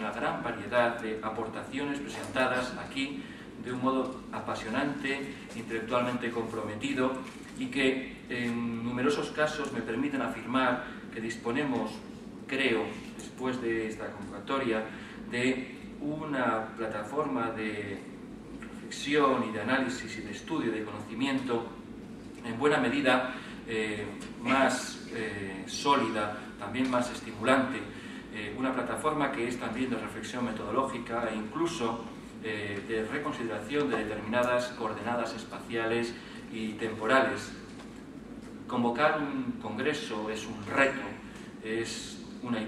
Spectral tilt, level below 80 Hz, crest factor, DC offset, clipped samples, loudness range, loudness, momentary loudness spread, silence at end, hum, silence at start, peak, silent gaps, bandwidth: -4.5 dB/octave; -60 dBFS; 24 dB; under 0.1%; under 0.1%; 3 LU; -32 LUFS; 14 LU; 0 s; none; 0 s; -8 dBFS; none; 13 kHz